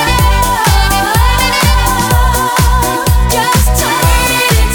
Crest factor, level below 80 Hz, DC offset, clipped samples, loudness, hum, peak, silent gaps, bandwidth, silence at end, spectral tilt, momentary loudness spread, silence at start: 10 dB; -14 dBFS; under 0.1%; under 0.1%; -10 LUFS; none; 0 dBFS; none; over 20 kHz; 0 s; -3.5 dB/octave; 2 LU; 0 s